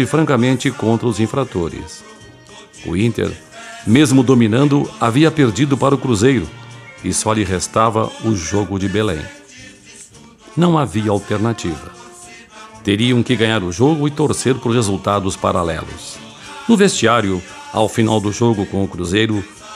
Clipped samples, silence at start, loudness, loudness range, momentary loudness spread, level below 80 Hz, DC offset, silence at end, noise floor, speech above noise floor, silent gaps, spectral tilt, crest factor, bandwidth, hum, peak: under 0.1%; 0 s; -16 LUFS; 6 LU; 18 LU; -44 dBFS; under 0.1%; 0 s; -42 dBFS; 26 dB; none; -5.5 dB/octave; 16 dB; 14 kHz; none; 0 dBFS